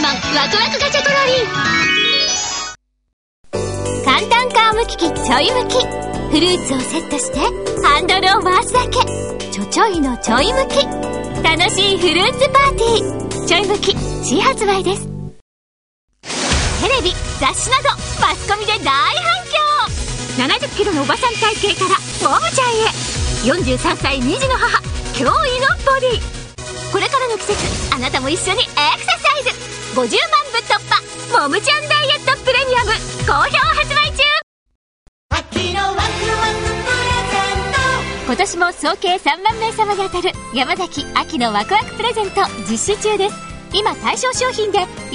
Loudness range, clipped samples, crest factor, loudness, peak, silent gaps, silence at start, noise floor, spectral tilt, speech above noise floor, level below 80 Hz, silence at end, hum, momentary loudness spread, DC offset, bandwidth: 4 LU; under 0.1%; 16 dB; -15 LUFS; 0 dBFS; 3.13-3.44 s, 15.41-16.08 s, 34.43-34.66 s, 34.75-35.29 s; 0 s; under -90 dBFS; -3 dB/octave; over 74 dB; -32 dBFS; 0 s; none; 8 LU; under 0.1%; 11 kHz